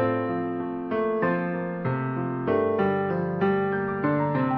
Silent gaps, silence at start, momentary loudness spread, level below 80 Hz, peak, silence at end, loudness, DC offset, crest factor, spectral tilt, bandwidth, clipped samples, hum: none; 0 s; 5 LU; -58 dBFS; -12 dBFS; 0 s; -26 LUFS; under 0.1%; 14 dB; -11 dB/octave; 5.6 kHz; under 0.1%; none